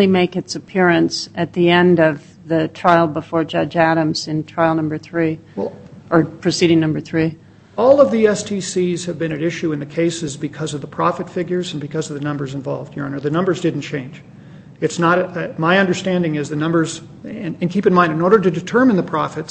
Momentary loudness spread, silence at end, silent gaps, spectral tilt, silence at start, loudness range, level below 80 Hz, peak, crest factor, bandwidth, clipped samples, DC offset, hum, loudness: 12 LU; 0 s; none; -6 dB/octave; 0 s; 6 LU; -54 dBFS; 0 dBFS; 18 dB; 8.6 kHz; under 0.1%; under 0.1%; none; -18 LUFS